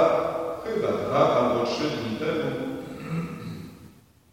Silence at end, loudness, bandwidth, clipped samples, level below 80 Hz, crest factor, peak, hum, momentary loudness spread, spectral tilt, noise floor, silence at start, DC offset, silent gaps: 0.4 s; -26 LUFS; 16.5 kHz; under 0.1%; -58 dBFS; 20 dB; -6 dBFS; none; 15 LU; -6 dB/octave; -52 dBFS; 0 s; under 0.1%; none